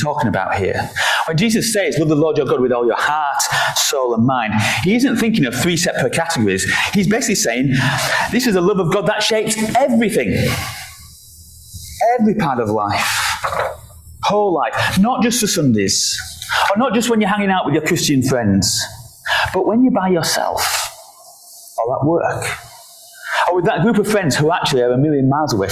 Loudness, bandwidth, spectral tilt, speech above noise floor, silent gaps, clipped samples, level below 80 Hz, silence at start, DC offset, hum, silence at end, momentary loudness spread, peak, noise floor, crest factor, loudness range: -16 LUFS; 16 kHz; -4 dB/octave; 26 dB; none; under 0.1%; -42 dBFS; 0 s; under 0.1%; none; 0 s; 6 LU; -4 dBFS; -42 dBFS; 14 dB; 3 LU